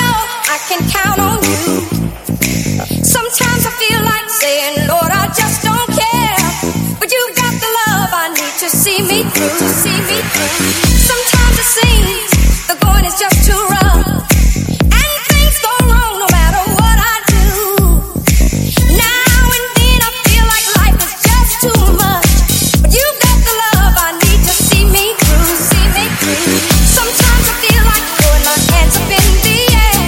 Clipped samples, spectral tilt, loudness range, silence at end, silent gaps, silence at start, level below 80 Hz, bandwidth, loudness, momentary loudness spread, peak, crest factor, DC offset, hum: 0.3%; -3.5 dB/octave; 3 LU; 0 s; none; 0 s; -14 dBFS; 17.5 kHz; -10 LUFS; 4 LU; 0 dBFS; 10 dB; under 0.1%; none